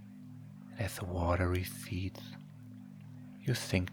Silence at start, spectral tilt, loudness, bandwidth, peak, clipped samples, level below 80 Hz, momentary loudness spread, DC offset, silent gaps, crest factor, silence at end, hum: 0 s; -5.5 dB/octave; -36 LUFS; 19 kHz; -14 dBFS; under 0.1%; -54 dBFS; 19 LU; under 0.1%; none; 22 dB; 0 s; 50 Hz at -55 dBFS